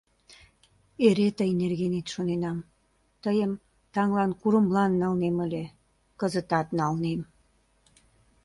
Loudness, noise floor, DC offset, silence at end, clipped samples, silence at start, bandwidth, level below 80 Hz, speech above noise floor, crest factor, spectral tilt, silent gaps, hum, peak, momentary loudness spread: -27 LUFS; -68 dBFS; under 0.1%; 1.2 s; under 0.1%; 1 s; 11.5 kHz; -60 dBFS; 43 dB; 20 dB; -7 dB/octave; none; none; -8 dBFS; 12 LU